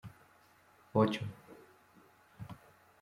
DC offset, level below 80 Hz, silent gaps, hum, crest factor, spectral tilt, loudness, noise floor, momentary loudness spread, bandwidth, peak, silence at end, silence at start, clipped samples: under 0.1%; -72 dBFS; none; none; 24 dB; -7.5 dB/octave; -34 LUFS; -65 dBFS; 25 LU; 15.5 kHz; -16 dBFS; 0.45 s; 0.05 s; under 0.1%